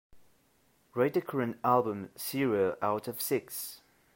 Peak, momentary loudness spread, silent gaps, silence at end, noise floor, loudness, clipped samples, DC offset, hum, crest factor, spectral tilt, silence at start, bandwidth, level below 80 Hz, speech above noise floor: -12 dBFS; 11 LU; none; 0.4 s; -69 dBFS; -31 LUFS; under 0.1%; under 0.1%; none; 20 dB; -5 dB/octave; 0.15 s; 16.5 kHz; -74 dBFS; 38 dB